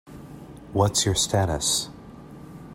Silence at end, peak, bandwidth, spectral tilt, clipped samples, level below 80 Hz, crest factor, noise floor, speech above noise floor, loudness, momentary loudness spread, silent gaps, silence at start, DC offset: 0 s; -8 dBFS; 16 kHz; -3.5 dB/octave; under 0.1%; -46 dBFS; 20 dB; -43 dBFS; 20 dB; -23 LUFS; 22 LU; none; 0.05 s; under 0.1%